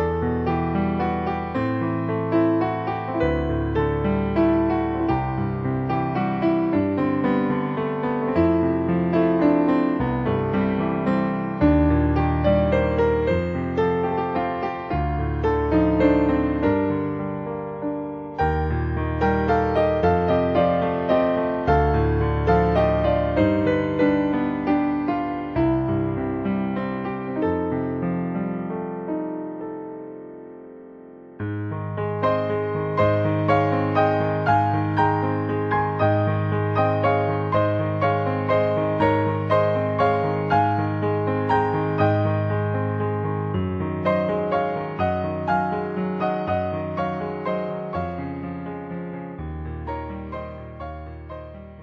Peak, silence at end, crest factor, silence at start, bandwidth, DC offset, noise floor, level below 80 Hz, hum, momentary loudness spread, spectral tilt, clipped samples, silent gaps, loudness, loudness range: -4 dBFS; 0 s; 18 dB; 0 s; 6.2 kHz; under 0.1%; -43 dBFS; -36 dBFS; none; 11 LU; -9.5 dB/octave; under 0.1%; none; -22 LUFS; 7 LU